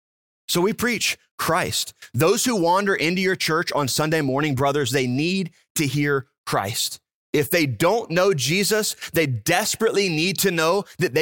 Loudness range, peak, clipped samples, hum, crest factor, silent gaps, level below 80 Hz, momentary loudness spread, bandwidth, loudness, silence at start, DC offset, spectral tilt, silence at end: 2 LU; -4 dBFS; under 0.1%; none; 18 dB; 1.31-1.38 s, 5.70-5.75 s, 6.38-6.44 s, 7.14-7.33 s; -58 dBFS; 6 LU; 17 kHz; -21 LUFS; 0.5 s; under 0.1%; -4 dB/octave; 0 s